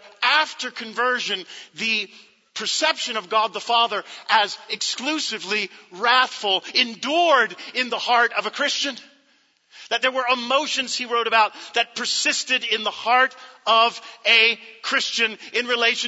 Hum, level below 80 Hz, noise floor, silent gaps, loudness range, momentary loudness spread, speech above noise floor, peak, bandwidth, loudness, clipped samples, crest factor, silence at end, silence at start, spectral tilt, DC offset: none; -84 dBFS; -62 dBFS; none; 4 LU; 9 LU; 40 dB; -4 dBFS; 8 kHz; -21 LUFS; under 0.1%; 20 dB; 0 s; 0.05 s; 0 dB/octave; under 0.1%